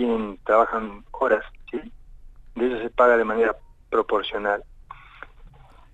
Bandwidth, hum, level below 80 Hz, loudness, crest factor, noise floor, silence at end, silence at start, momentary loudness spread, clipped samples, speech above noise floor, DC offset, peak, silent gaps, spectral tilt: 8 kHz; none; -48 dBFS; -23 LUFS; 18 dB; -47 dBFS; 0.45 s; 0 s; 17 LU; under 0.1%; 26 dB; under 0.1%; -6 dBFS; none; -6 dB/octave